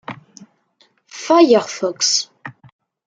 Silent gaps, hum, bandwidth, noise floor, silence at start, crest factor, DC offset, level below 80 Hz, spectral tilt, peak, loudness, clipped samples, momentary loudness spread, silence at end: none; none; 9.4 kHz; -59 dBFS; 0.1 s; 18 dB; under 0.1%; -68 dBFS; -2.5 dB/octave; 0 dBFS; -15 LUFS; under 0.1%; 25 LU; 0.55 s